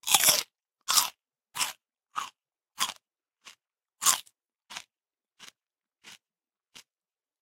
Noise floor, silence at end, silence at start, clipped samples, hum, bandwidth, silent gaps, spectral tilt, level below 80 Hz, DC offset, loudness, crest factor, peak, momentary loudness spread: under -90 dBFS; 1.25 s; 0.05 s; under 0.1%; none; 17 kHz; none; 2 dB/octave; -76 dBFS; under 0.1%; -26 LUFS; 32 dB; -2 dBFS; 22 LU